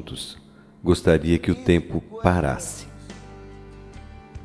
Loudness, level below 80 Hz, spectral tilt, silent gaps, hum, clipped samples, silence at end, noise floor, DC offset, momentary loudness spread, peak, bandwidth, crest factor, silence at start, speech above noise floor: -22 LUFS; -40 dBFS; -6 dB/octave; none; none; under 0.1%; 0 s; -42 dBFS; under 0.1%; 24 LU; -2 dBFS; 11 kHz; 22 dB; 0 s; 20 dB